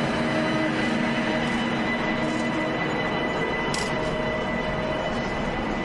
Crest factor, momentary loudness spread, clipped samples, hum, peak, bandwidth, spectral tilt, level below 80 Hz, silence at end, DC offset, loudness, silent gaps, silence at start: 14 dB; 3 LU; under 0.1%; none; -12 dBFS; 11.5 kHz; -5 dB/octave; -42 dBFS; 0 s; under 0.1%; -25 LUFS; none; 0 s